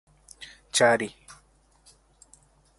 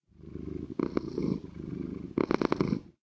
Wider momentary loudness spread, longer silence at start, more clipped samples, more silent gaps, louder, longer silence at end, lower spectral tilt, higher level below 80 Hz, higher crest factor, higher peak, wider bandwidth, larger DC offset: first, 24 LU vs 12 LU; first, 0.4 s vs 0.2 s; neither; neither; first, -24 LUFS vs -33 LUFS; first, 1.7 s vs 0.1 s; second, -2.5 dB/octave vs -8 dB/octave; second, -64 dBFS vs -52 dBFS; about the same, 22 dB vs 26 dB; about the same, -8 dBFS vs -8 dBFS; first, 11.5 kHz vs 8 kHz; neither